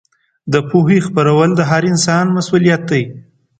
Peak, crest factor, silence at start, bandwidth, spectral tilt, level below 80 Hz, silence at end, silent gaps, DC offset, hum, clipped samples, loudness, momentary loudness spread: 0 dBFS; 14 dB; 0.45 s; 9.2 kHz; -6 dB/octave; -52 dBFS; 0.4 s; none; under 0.1%; none; under 0.1%; -13 LUFS; 6 LU